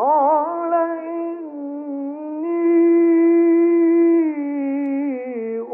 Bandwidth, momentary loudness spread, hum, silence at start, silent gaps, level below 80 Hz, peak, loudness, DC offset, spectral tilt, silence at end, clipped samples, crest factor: 2.9 kHz; 13 LU; none; 0 s; none; -86 dBFS; -6 dBFS; -18 LUFS; under 0.1%; -10.5 dB/octave; 0 s; under 0.1%; 10 dB